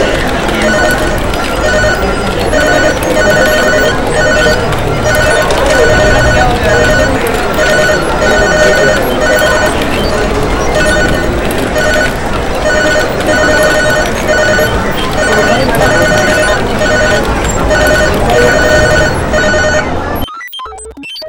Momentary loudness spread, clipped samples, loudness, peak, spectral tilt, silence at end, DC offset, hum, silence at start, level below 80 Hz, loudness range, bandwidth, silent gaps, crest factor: 6 LU; 0.4%; -9 LUFS; 0 dBFS; -4 dB/octave; 0 s; under 0.1%; none; 0 s; -20 dBFS; 2 LU; 17 kHz; none; 10 dB